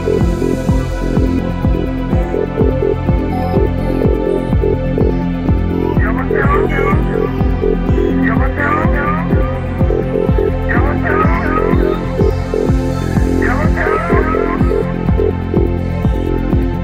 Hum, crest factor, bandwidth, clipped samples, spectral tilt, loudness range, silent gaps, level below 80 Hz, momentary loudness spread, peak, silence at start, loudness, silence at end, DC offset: none; 12 dB; 10 kHz; under 0.1%; -8.5 dB/octave; 1 LU; none; -20 dBFS; 3 LU; -2 dBFS; 0 s; -15 LUFS; 0 s; 0.3%